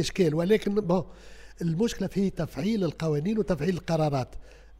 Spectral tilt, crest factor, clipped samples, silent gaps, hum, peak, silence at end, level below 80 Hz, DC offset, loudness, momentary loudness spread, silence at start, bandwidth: -6.5 dB/octave; 16 dB; under 0.1%; none; none; -12 dBFS; 0.05 s; -48 dBFS; under 0.1%; -27 LUFS; 7 LU; 0 s; 15.5 kHz